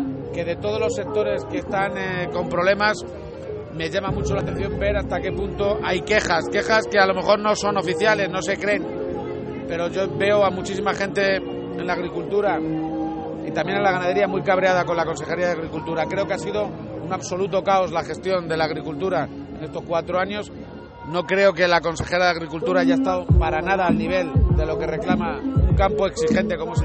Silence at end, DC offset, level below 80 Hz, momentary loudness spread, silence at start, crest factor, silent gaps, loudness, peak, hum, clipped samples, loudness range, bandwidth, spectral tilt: 0 s; under 0.1%; -34 dBFS; 10 LU; 0 s; 18 dB; none; -22 LUFS; -4 dBFS; none; under 0.1%; 4 LU; 8.8 kHz; -5.5 dB/octave